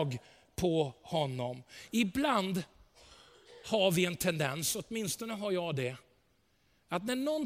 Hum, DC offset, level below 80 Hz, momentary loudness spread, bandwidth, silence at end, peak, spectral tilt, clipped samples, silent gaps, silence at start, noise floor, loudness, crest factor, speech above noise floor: none; under 0.1%; -62 dBFS; 12 LU; 16.5 kHz; 0 s; -14 dBFS; -4.5 dB/octave; under 0.1%; none; 0 s; -72 dBFS; -33 LUFS; 20 dB; 39 dB